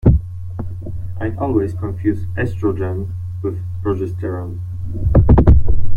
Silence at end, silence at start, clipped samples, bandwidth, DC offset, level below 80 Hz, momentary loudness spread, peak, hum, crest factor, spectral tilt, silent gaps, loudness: 0 s; 0.05 s; under 0.1%; 3 kHz; under 0.1%; -22 dBFS; 16 LU; -2 dBFS; none; 14 dB; -11 dB/octave; none; -19 LUFS